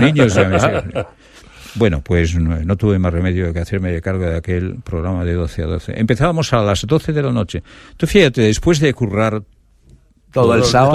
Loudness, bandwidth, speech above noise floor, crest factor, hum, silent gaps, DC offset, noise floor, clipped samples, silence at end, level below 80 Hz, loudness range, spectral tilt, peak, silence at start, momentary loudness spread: -16 LUFS; 13.5 kHz; 33 dB; 16 dB; none; none; under 0.1%; -48 dBFS; under 0.1%; 0 s; -30 dBFS; 3 LU; -6 dB/octave; 0 dBFS; 0 s; 11 LU